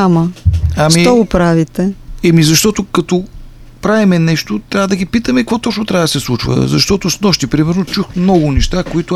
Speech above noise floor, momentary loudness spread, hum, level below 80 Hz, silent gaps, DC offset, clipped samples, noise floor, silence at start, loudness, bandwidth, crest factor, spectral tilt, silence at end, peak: 20 dB; 7 LU; none; -26 dBFS; none; under 0.1%; under 0.1%; -32 dBFS; 0 s; -12 LUFS; 14.5 kHz; 12 dB; -5 dB/octave; 0 s; 0 dBFS